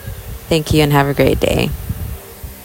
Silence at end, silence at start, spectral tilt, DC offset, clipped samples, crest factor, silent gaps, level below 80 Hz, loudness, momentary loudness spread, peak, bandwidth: 0 s; 0 s; -5.5 dB/octave; under 0.1%; under 0.1%; 16 dB; none; -30 dBFS; -15 LUFS; 18 LU; 0 dBFS; 17 kHz